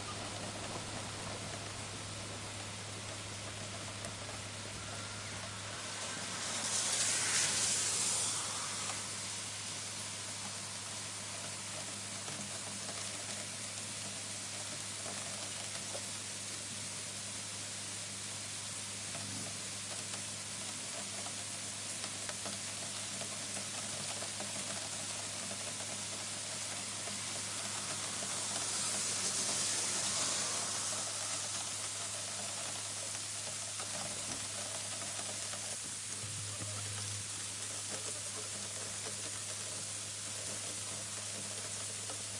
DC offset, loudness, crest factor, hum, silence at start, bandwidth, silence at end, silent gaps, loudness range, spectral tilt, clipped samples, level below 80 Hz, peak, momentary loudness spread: under 0.1%; -38 LUFS; 20 dB; none; 0 s; 11.5 kHz; 0 s; none; 7 LU; -1 dB/octave; under 0.1%; -70 dBFS; -20 dBFS; 9 LU